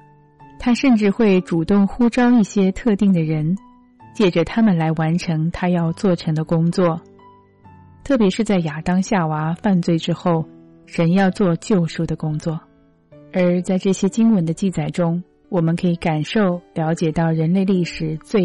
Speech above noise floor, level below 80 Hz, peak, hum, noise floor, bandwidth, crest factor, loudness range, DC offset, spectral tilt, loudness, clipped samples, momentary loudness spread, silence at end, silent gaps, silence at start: 32 dB; -46 dBFS; -8 dBFS; none; -49 dBFS; 11 kHz; 10 dB; 3 LU; under 0.1%; -7 dB/octave; -19 LUFS; under 0.1%; 8 LU; 0 s; none; 0.4 s